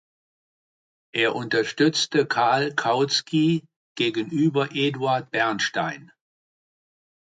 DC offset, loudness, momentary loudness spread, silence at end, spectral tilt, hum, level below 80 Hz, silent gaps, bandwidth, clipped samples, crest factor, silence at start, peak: under 0.1%; -23 LUFS; 5 LU; 1.35 s; -4.5 dB/octave; none; -72 dBFS; 3.76-3.95 s; 9.4 kHz; under 0.1%; 16 dB; 1.15 s; -8 dBFS